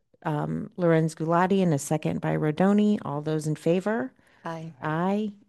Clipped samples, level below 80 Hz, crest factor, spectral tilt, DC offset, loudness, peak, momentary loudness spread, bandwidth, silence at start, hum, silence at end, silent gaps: under 0.1%; -66 dBFS; 18 dB; -7 dB/octave; under 0.1%; -26 LUFS; -8 dBFS; 12 LU; 12.5 kHz; 0.25 s; none; 0.15 s; none